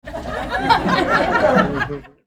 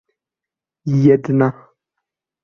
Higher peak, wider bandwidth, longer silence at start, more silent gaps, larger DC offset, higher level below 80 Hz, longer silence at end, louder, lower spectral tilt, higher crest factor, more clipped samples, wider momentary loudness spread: about the same, 0 dBFS vs -2 dBFS; first, 16 kHz vs 6.8 kHz; second, 0.05 s vs 0.85 s; neither; neither; first, -38 dBFS vs -60 dBFS; second, 0.2 s vs 0.9 s; about the same, -17 LUFS vs -16 LUFS; second, -5.5 dB/octave vs -10 dB/octave; about the same, 18 dB vs 18 dB; neither; first, 11 LU vs 8 LU